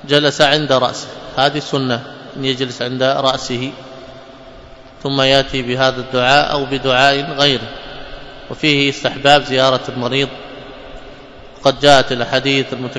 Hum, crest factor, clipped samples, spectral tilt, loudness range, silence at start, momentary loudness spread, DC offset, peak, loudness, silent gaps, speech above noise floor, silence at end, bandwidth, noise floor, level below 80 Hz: none; 16 dB; 0.1%; -4 dB/octave; 4 LU; 0 s; 20 LU; under 0.1%; 0 dBFS; -15 LUFS; none; 23 dB; 0 s; 11 kHz; -38 dBFS; -42 dBFS